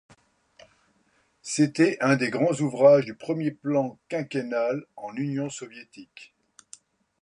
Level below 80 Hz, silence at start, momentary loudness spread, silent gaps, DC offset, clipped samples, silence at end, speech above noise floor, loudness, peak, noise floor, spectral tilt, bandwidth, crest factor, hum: -74 dBFS; 1.45 s; 20 LU; none; under 0.1%; under 0.1%; 0.95 s; 42 dB; -25 LUFS; -6 dBFS; -67 dBFS; -6 dB/octave; 11 kHz; 20 dB; none